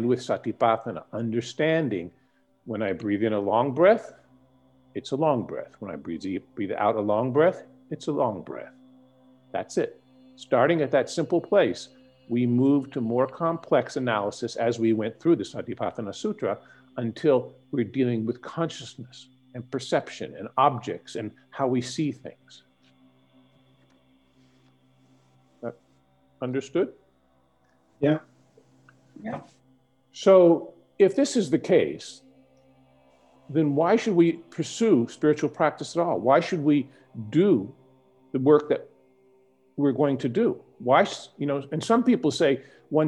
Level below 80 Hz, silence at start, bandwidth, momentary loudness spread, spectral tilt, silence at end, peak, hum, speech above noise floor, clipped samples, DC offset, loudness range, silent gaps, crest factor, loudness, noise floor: -72 dBFS; 0 s; 11 kHz; 16 LU; -6.5 dB/octave; 0 s; -6 dBFS; none; 41 dB; under 0.1%; under 0.1%; 9 LU; none; 20 dB; -25 LUFS; -65 dBFS